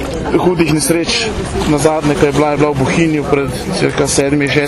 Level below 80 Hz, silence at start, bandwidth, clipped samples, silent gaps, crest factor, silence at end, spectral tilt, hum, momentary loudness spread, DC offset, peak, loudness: -30 dBFS; 0 s; 14 kHz; under 0.1%; none; 14 dB; 0 s; -5 dB/octave; none; 4 LU; under 0.1%; 0 dBFS; -13 LUFS